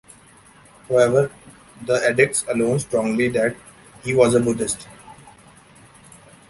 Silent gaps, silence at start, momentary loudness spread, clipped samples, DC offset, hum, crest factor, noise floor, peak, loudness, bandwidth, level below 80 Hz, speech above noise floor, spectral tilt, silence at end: none; 0.9 s; 13 LU; under 0.1%; under 0.1%; none; 20 dB; -49 dBFS; -2 dBFS; -20 LUFS; 11.5 kHz; -54 dBFS; 30 dB; -5 dB/octave; 1.35 s